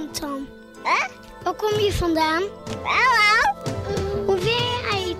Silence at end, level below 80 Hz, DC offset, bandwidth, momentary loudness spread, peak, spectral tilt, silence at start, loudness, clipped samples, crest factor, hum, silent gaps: 0 s; -40 dBFS; under 0.1%; 16 kHz; 14 LU; -8 dBFS; -4 dB/octave; 0 s; -21 LUFS; under 0.1%; 14 dB; none; none